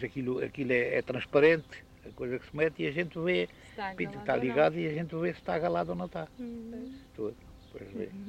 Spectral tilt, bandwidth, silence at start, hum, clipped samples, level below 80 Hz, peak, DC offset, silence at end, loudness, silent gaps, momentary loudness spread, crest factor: -7.5 dB/octave; 9.2 kHz; 0 s; none; under 0.1%; -60 dBFS; -12 dBFS; under 0.1%; 0 s; -31 LUFS; none; 17 LU; 20 dB